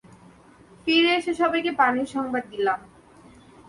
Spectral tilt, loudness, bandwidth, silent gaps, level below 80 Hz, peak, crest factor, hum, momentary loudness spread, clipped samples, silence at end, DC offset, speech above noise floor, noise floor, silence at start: -4 dB/octave; -23 LUFS; 11.5 kHz; none; -62 dBFS; -8 dBFS; 18 dB; none; 9 LU; under 0.1%; 0.8 s; under 0.1%; 29 dB; -52 dBFS; 0.85 s